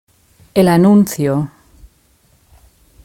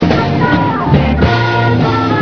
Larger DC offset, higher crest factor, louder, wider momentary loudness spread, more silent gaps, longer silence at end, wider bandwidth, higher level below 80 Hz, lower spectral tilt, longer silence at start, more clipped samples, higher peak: neither; about the same, 16 dB vs 12 dB; about the same, -13 LUFS vs -12 LUFS; first, 11 LU vs 1 LU; neither; first, 1.6 s vs 0 s; first, 17 kHz vs 5.4 kHz; second, -48 dBFS vs -24 dBFS; about the same, -7 dB/octave vs -8 dB/octave; first, 0.55 s vs 0 s; second, under 0.1% vs 0.2%; about the same, 0 dBFS vs 0 dBFS